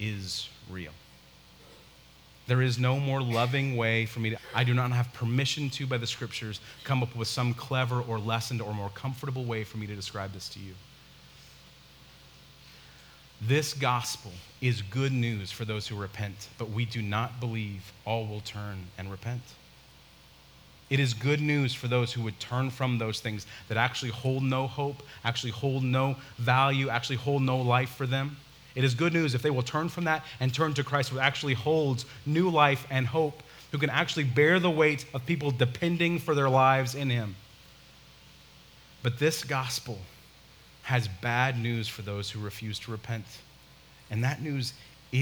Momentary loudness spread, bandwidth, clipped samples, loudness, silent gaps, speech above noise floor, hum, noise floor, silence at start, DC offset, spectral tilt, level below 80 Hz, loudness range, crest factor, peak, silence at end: 13 LU; over 20 kHz; under 0.1%; -29 LUFS; none; 26 dB; none; -55 dBFS; 0 s; under 0.1%; -5.5 dB/octave; -62 dBFS; 9 LU; 22 dB; -6 dBFS; 0 s